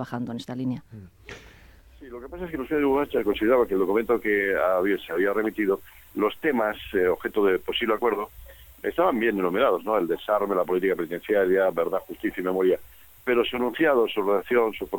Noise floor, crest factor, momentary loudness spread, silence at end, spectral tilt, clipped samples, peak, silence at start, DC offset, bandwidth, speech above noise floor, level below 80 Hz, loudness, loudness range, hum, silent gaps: -51 dBFS; 16 dB; 12 LU; 0 s; -6 dB/octave; under 0.1%; -10 dBFS; 0 s; under 0.1%; 17.5 kHz; 26 dB; -54 dBFS; -24 LUFS; 2 LU; none; none